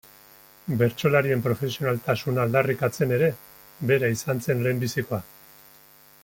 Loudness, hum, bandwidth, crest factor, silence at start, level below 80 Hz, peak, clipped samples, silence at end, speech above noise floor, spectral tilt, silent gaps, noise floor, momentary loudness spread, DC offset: -24 LUFS; none; 17 kHz; 18 dB; 0.65 s; -60 dBFS; -6 dBFS; under 0.1%; 1 s; 29 dB; -6 dB/octave; none; -53 dBFS; 9 LU; under 0.1%